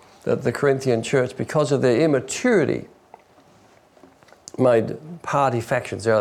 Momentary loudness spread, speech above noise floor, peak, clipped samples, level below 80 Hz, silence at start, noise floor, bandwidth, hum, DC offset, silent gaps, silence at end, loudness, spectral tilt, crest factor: 7 LU; 33 dB; -8 dBFS; under 0.1%; -62 dBFS; 0.25 s; -53 dBFS; 14 kHz; none; under 0.1%; none; 0 s; -21 LUFS; -6 dB/octave; 14 dB